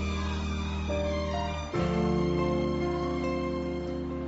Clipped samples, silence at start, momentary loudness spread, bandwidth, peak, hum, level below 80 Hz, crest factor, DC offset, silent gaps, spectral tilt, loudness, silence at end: under 0.1%; 0 s; 5 LU; 8 kHz; -18 dBFS; none; -40 dBFS; 12 dB; under 0.1%; none; -6 dB/octave; -30 LUFS; 0 s